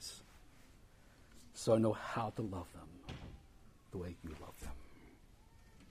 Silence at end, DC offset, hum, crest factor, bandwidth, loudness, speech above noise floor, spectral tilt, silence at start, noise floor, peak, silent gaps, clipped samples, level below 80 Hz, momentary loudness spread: 0 s; under 0.1%; none; 24 dB; 15.5 kHz; -40 LUFS; 24 dB; -6 dB/octave; 0 s; -62 dBFS; -18 dBFS; none; under 0.1%; -60 dBFS; 28 LU